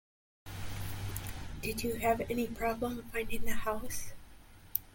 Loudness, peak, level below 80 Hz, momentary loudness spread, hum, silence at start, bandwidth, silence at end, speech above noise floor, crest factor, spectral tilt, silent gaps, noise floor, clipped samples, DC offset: -37 LUFS; -8 dBFS; -48 dBFS; 13 LU; none; 0.45 s; 17 kHz; 0.05 s; 22 dB; 26 dB; -4.5 dB/octave; none; -54 dBFS; under 0.1%; under 0.1%